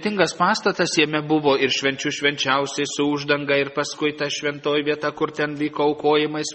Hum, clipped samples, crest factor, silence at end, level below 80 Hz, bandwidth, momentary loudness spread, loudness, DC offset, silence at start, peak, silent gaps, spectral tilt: none; under 0.1%; 18 dB; 0 s; -64 dBFS; 8.8 kHz; 5 LU; -21 LUFS; under 0.1%; 0 s; -4 dBFS; none; -3.5 dB/octave